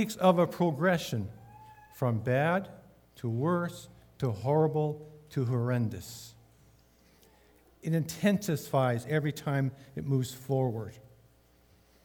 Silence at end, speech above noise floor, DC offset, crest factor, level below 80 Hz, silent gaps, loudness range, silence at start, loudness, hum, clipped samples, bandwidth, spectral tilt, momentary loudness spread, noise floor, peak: 1.05 s; 34 dB; under 0.1%; 22 dB; -66 dBFS; none; 3 LU; 0 s; -30 LUFS; none; under 0.1%; over 20 kHz; -6.5 dB/octave; 15 LU; -63 dBFS; -10 dBFS